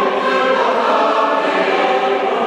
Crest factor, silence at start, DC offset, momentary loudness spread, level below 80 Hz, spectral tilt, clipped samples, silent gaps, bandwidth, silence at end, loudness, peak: 12 dB; 0 s; under 0.1%; 1 LU; -72 dBFS; -4 dB/octave; under 0.1%; none; 11.5 kHz; 0 s; -15 LUFS; -4 dBFS